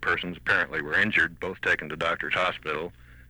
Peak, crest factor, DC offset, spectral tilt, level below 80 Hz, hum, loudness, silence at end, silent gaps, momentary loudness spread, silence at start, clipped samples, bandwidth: -10 dBFS; 16 dB; under 0.1%; -4.5 dB/octave; -54 dBFS; none; -26 LUFS; 0.05 s; none; 9 LU; 0 s; under 0.1%; over 20 kHz